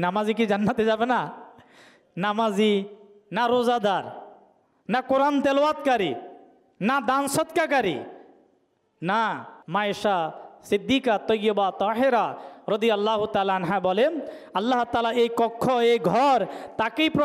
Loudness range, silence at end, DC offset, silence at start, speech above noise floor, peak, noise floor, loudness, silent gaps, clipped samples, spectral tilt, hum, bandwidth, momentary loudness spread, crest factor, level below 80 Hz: 3 LU; 0 s; under 0.1%; 0 s; 44 dB; -12 dBFS; -67 dBFS; -24 LUFS; none; under 0.1%; -5 dB/octave; none; 15.5 kHz; 11 LU; 12 dB; -64 dBFS